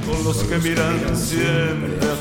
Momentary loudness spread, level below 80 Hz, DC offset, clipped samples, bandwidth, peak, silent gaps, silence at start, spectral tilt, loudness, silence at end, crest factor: 3 LU; -34 dBFS; under 0.1%; under 0.1%; 17 kHz; -6 dBFS; none; 0 s; -5 dB/octave; -20 LUFS; 0 s; 14 dB